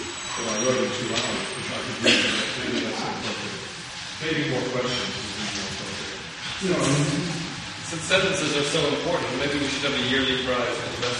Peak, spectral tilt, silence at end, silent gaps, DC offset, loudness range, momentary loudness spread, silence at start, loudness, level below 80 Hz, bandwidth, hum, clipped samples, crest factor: -4 dBFS; -3.5 dB/octave; 0 s; none; under 0.1%; 4 LU; 10 LU; 0 s; -25 LUFS; -52 dBFS; 11.5 kHz; none; under 0.1%; 22 dB